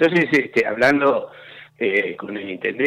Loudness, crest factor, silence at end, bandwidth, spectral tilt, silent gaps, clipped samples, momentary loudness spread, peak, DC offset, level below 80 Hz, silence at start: -19 LUFS; 14 dB; 0 s; 14.5 kHz; -6 dB/octave; none; under 0.1%; 14 LU; -6 dBFS; under 0.1%; -64 dBFS; 0 s